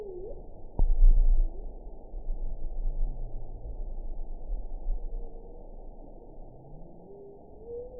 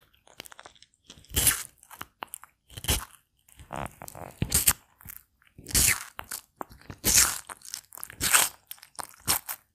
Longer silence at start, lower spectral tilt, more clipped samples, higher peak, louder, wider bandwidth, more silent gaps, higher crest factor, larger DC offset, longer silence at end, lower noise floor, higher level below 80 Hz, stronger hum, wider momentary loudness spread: second, 0 s vs 1.1 s; first, -15.5 dB/octave vs -1 dB/octave; neither; second, -10 dBFS vs 0 dBFS; second, -36 LUFS vs -24 LUFS; second, 1 kHz vs 16.5 kHz; neither; second, 18 dB vs 30 dB; first, 0.2% vs under 0.1%; second, 0 s vs 0.2 s; second, -48 dBFS vs -59 dBFS; first, -28 dBFS vs -44 dBFS; neither; about the same, 22 LU vs 24 LU